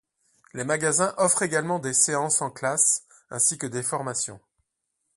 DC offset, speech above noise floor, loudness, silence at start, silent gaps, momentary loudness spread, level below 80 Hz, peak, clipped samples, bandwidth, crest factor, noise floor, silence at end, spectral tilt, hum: under 0.1%; 54 dB; -23 LUFS; 0.55 s; none; 9 LU; -68 dBFS; -6 dBFS; under 0.1%; 12 kHz; 20 dB; -79 dBFS; 0.8 s; -2.5 dB/octave; none